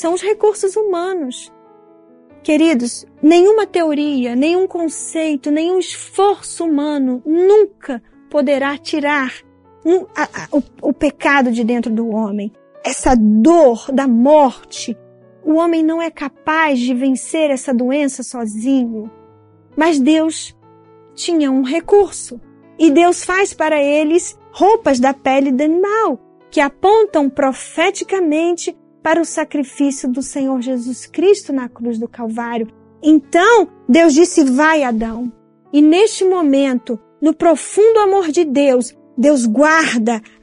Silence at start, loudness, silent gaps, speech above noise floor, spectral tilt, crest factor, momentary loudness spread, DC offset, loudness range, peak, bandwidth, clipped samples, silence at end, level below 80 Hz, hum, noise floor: 0 s; -15 LUFS; none; 33 dB; -4 dB/octave; 14 dB; 13 LU; under 0.1%; 5 LU; 0 dBFS; 11 kHz; under 0.1%; 0.25 s; -46 dBFS; none; -47 dBFS